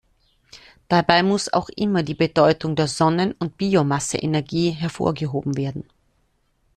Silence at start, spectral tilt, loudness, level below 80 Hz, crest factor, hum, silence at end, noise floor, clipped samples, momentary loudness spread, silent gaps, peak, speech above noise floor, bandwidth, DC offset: 0.55 s; -5.5 dB/octave; -21 LUFS; -52 dBFS; 22 dB; none; 0.95 s; -66 dBFS; under 0.1%; 8 LU; none; 0 dBFS; 45 dB; 12.5 kHz; under 0.1%